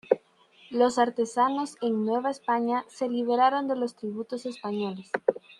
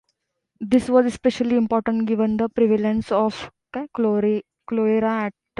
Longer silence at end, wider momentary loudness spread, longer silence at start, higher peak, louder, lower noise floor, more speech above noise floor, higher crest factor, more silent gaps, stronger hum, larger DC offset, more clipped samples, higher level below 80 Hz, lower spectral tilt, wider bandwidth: second, 0.05 s vs 0.3 s; about the same, 11 LU vs 10 LU; second, 0.1 s vs 0.6 s; about the same, -4 dBFS vs -4 dBFS; second, -27 LUFS vs -21 LUFS; second, -58 dBFS vs -75 dBFS; second, 31 dB vs 54 dB; first, 22 dB vs 16 dB; neither; neither; neither; neither; second, -76 dBFS vs -54 dBFS; second, -5 dB/octave vs -7 dB/octave; about the same, 11.5 kHz vs 11 kHz